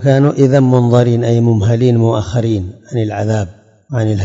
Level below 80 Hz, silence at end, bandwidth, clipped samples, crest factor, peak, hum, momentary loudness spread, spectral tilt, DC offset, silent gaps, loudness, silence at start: -46 dBFS; 0 s; 7.8 kHz; under 0.1%; 12 dB; 0 dBFS; none; 9 LU; -8 dB/octave; under 0.1%; none; -13 LUFS; 0 s